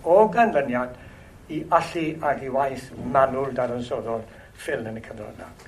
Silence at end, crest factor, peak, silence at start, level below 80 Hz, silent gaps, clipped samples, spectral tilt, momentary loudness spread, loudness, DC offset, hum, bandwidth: 0.05 s; 22 dB; -2 dBFS; 0 s; -52 dBFS; none; under 0.1%; -6.5 dB/octave; 17 LU; -24 LUFS; under 0.1%; none; 13.5 kHz